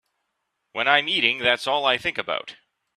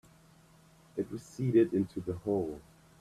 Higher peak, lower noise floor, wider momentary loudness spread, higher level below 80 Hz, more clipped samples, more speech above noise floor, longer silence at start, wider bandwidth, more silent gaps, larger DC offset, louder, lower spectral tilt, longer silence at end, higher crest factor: first, -2 dBFS vs -14 dBFS; first, -77 dBFS vs -61 dBFS; about the same, 11 LU vs 13 LU; about the same, -64 dBFS vs -64 dBFS; neither; first, 55 dB vs 29 dB; second, 0.75 s vs 0.95 s; first, 14 kHz vs 12.5 kHz; neither; neither; first, -21 LUFS vs -33 LUFS; second, -2.5 dB/octave vs -8.5 dB/octave; about the same, 0.45 s vs 0.4 s; about the same, 24 dB vs 20 dB